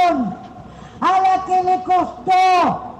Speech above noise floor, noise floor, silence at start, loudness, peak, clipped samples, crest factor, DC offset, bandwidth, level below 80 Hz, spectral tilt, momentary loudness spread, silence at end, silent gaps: 21 dB; -37 dBFS; 0 s; -17 LUFS; -10 dBFS; under 0.1%; 8 dB; under 0.1%; 9 kHz; -50 dBFS; -5 dB/octave; 8 LU; 0 s; none